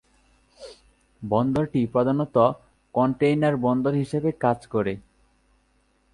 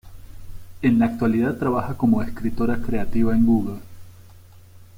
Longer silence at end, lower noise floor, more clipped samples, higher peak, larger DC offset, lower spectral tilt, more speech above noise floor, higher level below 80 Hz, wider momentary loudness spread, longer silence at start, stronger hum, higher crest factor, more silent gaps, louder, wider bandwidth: first, 1.15 s vs 0.15 s; first, -65 dBFS vs -45 dBFS; neither; first, -4 dBFS vs -8 dBFS; neither; about the same, -8.5 dB/octave vs -8.5 dB/octave; first, 43 dB vs 26 dB; second, -56 dBFS vs -38 dBFS; first, 18 LU vs 7 LU; first, 0.6 s vs 0.05 s; neither; first, 20 dB vs 14 dB; neither; about the same, -23 LUFS vs -22 LUFS; second, 11 kHz vs 16 kHz